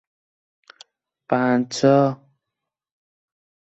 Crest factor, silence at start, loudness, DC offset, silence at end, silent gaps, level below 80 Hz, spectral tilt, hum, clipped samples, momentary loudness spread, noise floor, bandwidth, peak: 20 dB; 1.3 s; -19 LUFS; under 0.1%; 1.55 s; none; -68 dBFS; -6 dB/octave; none; under 0.1%; 8 LU; -84 dBFS; 8.2 kHz; -4 dBFS